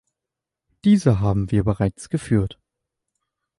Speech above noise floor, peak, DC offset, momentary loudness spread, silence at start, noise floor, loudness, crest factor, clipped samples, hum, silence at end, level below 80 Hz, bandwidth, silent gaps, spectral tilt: 67 dB; -4 dBFS; under 0.1%; 8 LU; 0.85 s; -86 dBFS; -21 LUFS; 18 dB; under 0.1%; none; 1.05 s; -40 dBFS; 11.5 kHz; none; -8 dB/octave